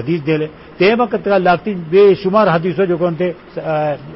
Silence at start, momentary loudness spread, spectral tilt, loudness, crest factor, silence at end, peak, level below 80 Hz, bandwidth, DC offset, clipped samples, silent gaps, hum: 0 s; 10 LU; -11.5 dB/octave; -15 LUFS; 12 dB; 0 s; -2 dBFS; -50 dBFS; 5.8 kHz; under 0.1%; under 0.1%; none; none